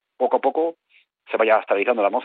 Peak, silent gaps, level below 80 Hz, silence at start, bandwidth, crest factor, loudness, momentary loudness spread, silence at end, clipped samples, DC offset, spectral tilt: -6 dBFS; none; -76 dBFS; 0.2 s; 4.5 kHz; 16 dB; -21 LUFS; 8 LU; 0 s; under 0.1%; under 0.1%; -8 dB/octave